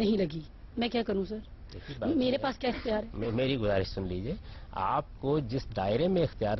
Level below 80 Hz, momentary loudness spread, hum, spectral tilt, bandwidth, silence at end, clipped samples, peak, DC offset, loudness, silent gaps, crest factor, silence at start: -46 dBFS; 14 LU; none; -8 dB/octave; 6.2 kHz; 0 s; under 0.1%; -16 dBFS; under 0.1%; -31 LUFS; none; 14 dB; 0 s